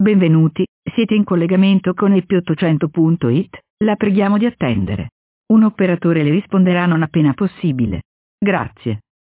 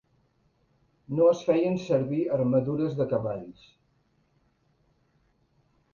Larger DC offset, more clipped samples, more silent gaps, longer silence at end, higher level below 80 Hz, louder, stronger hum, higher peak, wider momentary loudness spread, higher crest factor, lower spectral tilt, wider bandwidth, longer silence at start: neither; neither; first, 0.68-0.83 s, 3.70-3.77 s, 5.12-5.44 s, 8.05-8.38 s vs none; second, 0.4 s vs 2.45 s; first, -44 dBFS vs -64 dBFS; first, -16 LUFS vs -26 LUFS; neither; first, -4 dBFS vs -12 dBFS; about the same, 9 LU vs 11 LU; second, 12 dB vs 18 dB; first, -12 dB/octave vs -8.5 dB/octave; second, 4 kHz vs 7 kHz; second, 0 s vs 1.1 s